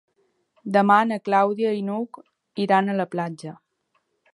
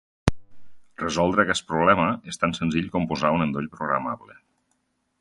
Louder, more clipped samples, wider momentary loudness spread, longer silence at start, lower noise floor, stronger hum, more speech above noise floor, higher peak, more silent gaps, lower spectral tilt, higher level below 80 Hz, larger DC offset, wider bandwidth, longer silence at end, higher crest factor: about the same, -22 LUFS vs -24 LUFS; neither; first, 19 LU vs 9 LU; first, 0.65 s vs 0.25 s; about the same, -71 dBFS vs -72 dBFS; neither; about the same, 50 dB vs 48 dB; second, -4 dBFS vs 0 dBFS; neither; first, -7 dB/octave vs -5.5 dB/octave; second, -78 dBFS vs -44 dBFS; neither; about the same, 11.5 kHz vs 11.5 kHz; about the same, 0.85 s vs 0.95 s; about the same, 20 dB vs 24 dB